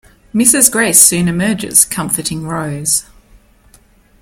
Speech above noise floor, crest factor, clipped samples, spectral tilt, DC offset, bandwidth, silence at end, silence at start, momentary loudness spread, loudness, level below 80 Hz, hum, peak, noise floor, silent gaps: 35 dB; 14 dB; 0.5%; -2.5 dB/octave; under 0.1%; over 20 kHz; 1.2 s; 0.35 s; 13 LU; -11 LUFS; -44 dBFS; none; 0 dBFS; -48 dBFS; none